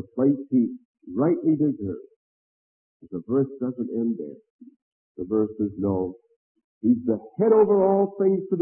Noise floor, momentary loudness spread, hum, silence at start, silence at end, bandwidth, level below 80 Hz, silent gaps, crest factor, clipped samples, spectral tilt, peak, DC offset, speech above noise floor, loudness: under -90 dBFS; 15 LU; none; 0 s; 0 s; 2.6 kHz; -66 dBFS; 0.85-0.94 s, 2.16-3.00 s, 4.50-4.59 s, 4.76-5.15 s, 6.36-6.55 s, 6.64-6.81 s; 16 dB; under 0.1%; -15 dB/octave; -8 dBFS; under 0.1%; over 67 dB; -24 LUFS